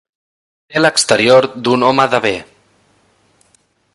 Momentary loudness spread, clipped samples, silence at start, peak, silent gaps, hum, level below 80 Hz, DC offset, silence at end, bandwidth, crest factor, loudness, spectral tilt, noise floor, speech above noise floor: 10 LU; under 0.1%; 0.7 s; 0 dBFS; none; none; -54 dBFS; under 0.1%; 1.5 s; 11.5 kHz; 16 dB; -12 LUFS; -3.5 dB/octave; -57 dBFS; 45 dB